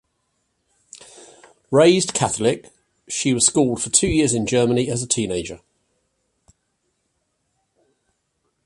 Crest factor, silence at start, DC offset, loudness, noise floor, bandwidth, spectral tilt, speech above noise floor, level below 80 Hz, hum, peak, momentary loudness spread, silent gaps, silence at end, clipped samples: 22 dB; 1.2 s; under 0.1%; -19 LUFS; -72 dBFS; 11.5 kHz; -4 dB/octave; 53 dB; -48 dBFS; none; 0 dBFS; 13 LU; none; 3.1 s; under 0.1%